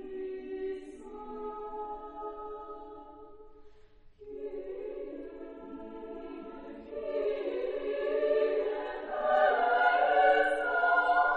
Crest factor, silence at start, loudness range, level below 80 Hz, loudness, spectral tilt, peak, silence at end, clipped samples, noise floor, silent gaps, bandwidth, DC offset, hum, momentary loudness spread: 20 dB; 0 s; 17 LU; -60 dBFS; -30 LUFS; -4.5 dB/octave; -12 dBFS; 0 s; under 0.1%; -55 dBFS; none; 9.6 kHz; under 0.1%; none; 20 LU